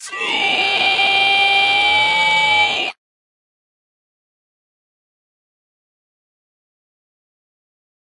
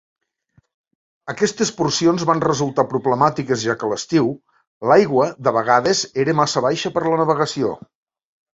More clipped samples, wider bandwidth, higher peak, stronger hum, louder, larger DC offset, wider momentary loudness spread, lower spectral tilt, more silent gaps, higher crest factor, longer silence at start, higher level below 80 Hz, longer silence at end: neither; first, 11.5 kHz vs 8 kHz; about the same, -4 dBFS vs -2 dBFS; neither; first, -13 LUFS vs -18 LUFS; neither; about the same, 6 LU vs 8 LU; second, -0.5 dB/octave vs -4.5 dB/octave; second, none vs 4.67-4.81 s; about the same, 16 dB vs 18 dB; second, 0 s vs 1.25 s; about the same, -60 dBFS vs -58 dBFS; first, 5.2 s vs 0.8 s